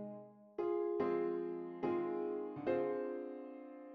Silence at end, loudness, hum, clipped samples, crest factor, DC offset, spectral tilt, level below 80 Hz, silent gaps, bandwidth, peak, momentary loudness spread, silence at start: 0 s; -40 LUFS; none; under 0.1%; 16 dB; under 0.1%; -6.5 dB/octave; -80 dBFS; none; 5 kHz; -24 dBFS; 14 LU; 0 s